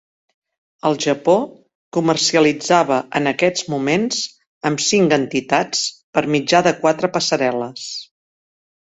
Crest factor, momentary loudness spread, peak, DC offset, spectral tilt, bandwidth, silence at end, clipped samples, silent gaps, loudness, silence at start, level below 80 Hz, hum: 18 dB; 10 LU; 0 dBFS; under 0.1%; -3.5 dB/octave; 8.2 kHz; 0.8 s; under 0.1%; 1.75-1.91 s, 4.47-4.61 s, 6.03-6.13 s; -18 LUFS; 0.85 s; -60 dBFS; none